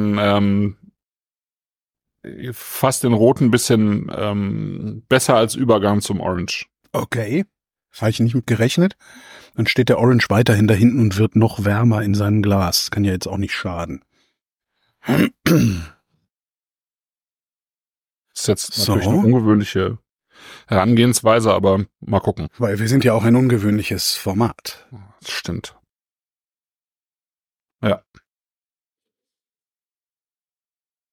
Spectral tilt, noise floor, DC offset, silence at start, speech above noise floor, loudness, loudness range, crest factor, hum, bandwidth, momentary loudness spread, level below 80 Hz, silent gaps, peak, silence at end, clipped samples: -5.5 dB/octave; under -90 dBFS; under 0.1%; 0 s; over 73 dB; -18 LUFS; 14 LU; 18 dB; none; 18.5 kHz; 13 LU; -48 dBFS; none; -2 dBFS; 3.15 s; under 0.1%